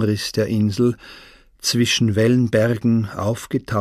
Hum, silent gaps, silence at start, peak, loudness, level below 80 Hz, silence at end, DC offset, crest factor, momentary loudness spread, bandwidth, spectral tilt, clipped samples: none; none; 0 s; -4 dBFS; -19 LUFS; -50 dBFS; 0 s; under 0.1%; 16 dB; 8 LU; 15 kHz; -5.5 dB/octave; under 0.1%